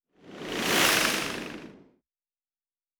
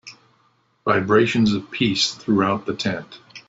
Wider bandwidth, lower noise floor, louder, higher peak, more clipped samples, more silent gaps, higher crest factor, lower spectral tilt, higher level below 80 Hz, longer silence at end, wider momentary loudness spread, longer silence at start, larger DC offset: first, over 20 kHz vs 8 kHz; first, under -90 dBFS vs -63 dBFS; second, -25 LUFS vs -20 LUFS; second, -8 dBFS vs -4 dBFS; neither; neither; about the same, 22 dB vs 18 dB; second, -1.5 dB/octave vs -5 dB/octave; about the same, -60 dBFS vs -56 dBFS; first, 1.25 s vs 0.1 s; first, 20 LU vs 10 LU; first, 0.25 s vs 0.05 s; neither